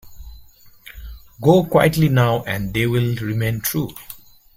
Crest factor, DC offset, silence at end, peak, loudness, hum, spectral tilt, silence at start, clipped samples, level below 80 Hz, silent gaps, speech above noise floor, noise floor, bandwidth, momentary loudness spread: 18 dB; under 0.1%; 0.4 s; -2 dBFS; -18 LUFS; none; -6 dB/octave; 0.05 s; under 0.1%; -42 dBFS; none; 28 dB; -46 dBFS; 16.5 kHz; 23 LU